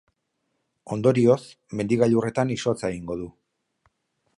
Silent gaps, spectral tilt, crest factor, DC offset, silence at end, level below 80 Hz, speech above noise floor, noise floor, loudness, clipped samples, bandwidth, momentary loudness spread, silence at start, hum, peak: none; -7 dB/octave; 18 dB; under 0.1%; 1.05 s; -58 dBFS; 53 dB; -76 dBFS; -24 LUFS; under 0.1%; 11.5 kHz; 14 LU; 0.85 s; none; -6 dBFS